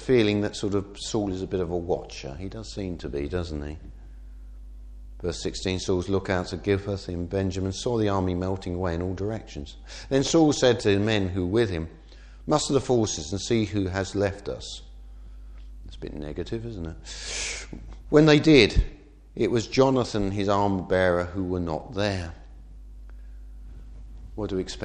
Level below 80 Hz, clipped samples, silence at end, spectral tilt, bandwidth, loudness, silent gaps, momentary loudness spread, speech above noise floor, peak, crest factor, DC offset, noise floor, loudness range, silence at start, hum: -40 dBFS; under 0.1%; 0 s; -5.5 dB/octave; 10.5 kHz; -25 LUFS; none; 24 LU; 20 dB; -2 dBFS; 24 dB; under 0.1%; -45 dBFS; 12 LU; 0 s; none